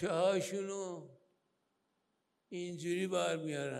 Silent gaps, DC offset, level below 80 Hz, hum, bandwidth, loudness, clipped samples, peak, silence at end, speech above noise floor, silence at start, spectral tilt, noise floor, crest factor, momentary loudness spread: none; under 0.1%; -80 dBFS; none; 15 kHz; -37 LUFS; under 0.1%; -20 dBFS; 0 s; 45 dB; 0 s; -4.5 dB/octave; -82 dBFS; 18 dB; 13 LU